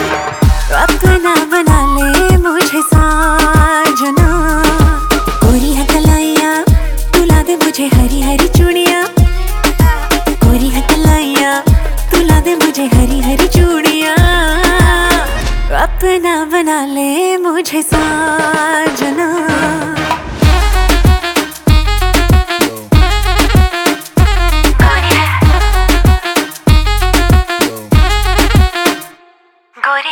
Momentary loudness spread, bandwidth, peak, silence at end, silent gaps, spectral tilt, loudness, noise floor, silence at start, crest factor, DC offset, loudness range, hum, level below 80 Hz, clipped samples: 5 LU; 19.5 kHz; 0 dBFS; 0 s; none; -5 dB/octave; -11 LUFS; -48 dBFS; 0 s; 10 dB; under 0.1%; 3 LU; none; -14 dBFS; under 0.1%